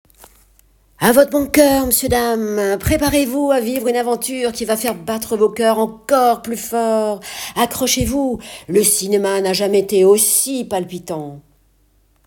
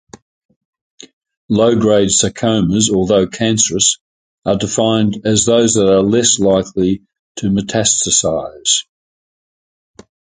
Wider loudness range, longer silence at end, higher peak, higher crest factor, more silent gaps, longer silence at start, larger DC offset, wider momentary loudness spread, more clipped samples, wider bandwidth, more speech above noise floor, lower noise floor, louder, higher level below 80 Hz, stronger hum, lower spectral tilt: about the same, 3 LU vs 3 LU; second, 0.85 s vs 1.55 s; about the same, 0 dBFS vs 0 dBFS; about the same, 16 dB vs 16 dB; second, none vs 1.13-1.21 s, 1.37-1.49 s, 4.01-4.38 s, 7.19-7.35 s; about the same, 1 s vs 1 s; neither; first, 10 LU vs 7 LU; neither; first, 19 kHz vs 9.6 kHz; second, 40 dB vs over 76 dB; second, -57 dBFS vs under -90 dBFS; second, -16 LUFS vs -13 LUFS; first, -38 dBFS vs -44 dBFS; neither; about the same, -3.5 dB/octave vs -3.5 dB/octave